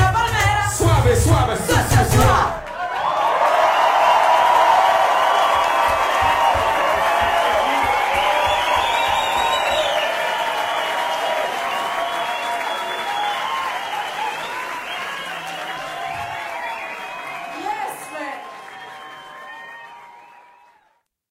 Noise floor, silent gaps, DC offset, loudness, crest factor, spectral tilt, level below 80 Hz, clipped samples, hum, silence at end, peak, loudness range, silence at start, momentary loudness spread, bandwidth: -64 dBFS; none; under 0.1%; -18 LUFS; 14 dB; -4 dB/octave; -36 dBFS; under 0.1%; none; 1.1 s; -4 dBFS; 14 LU; 0 s; 15 LU; 16.5 kHz